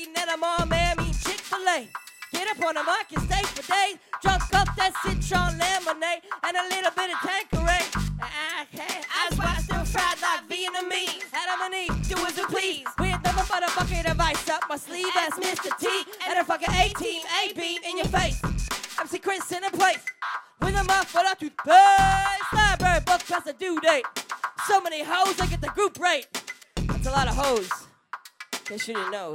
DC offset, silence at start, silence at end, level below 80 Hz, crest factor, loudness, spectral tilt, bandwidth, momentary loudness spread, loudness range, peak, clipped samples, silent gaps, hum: under 0.1%; 0 s; 0 s; -36 dBFS; 20 dB; -25 LUFS; -3.5 dB/octave; 16 kHz; 8 LU; 6 LU; -4 dBFS; under 0.1%; none; none